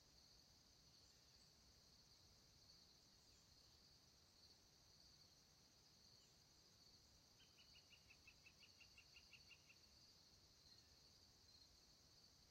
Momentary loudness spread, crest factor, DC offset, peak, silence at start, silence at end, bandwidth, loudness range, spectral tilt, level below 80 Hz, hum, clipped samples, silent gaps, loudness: 4 LU; 18 dB; under 0.1%; -54 dBFS; 0 s; 0 s; 16 kHz; 2 LU; -2 dB/octave; -84 dBFS; none; under 0.1%; none; -69 LUFS